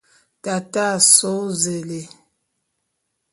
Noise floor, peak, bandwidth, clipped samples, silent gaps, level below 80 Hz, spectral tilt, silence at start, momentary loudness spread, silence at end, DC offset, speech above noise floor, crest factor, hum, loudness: -75 dBFS; 0 dBFS; 12 kHz; under 0.1%; none; -68 dBFS; -2 dB/octave; 0.45 s; 20 LU; 1.25 s; under 0.1%; 55 dB; 22 dB; none; -16 LUFS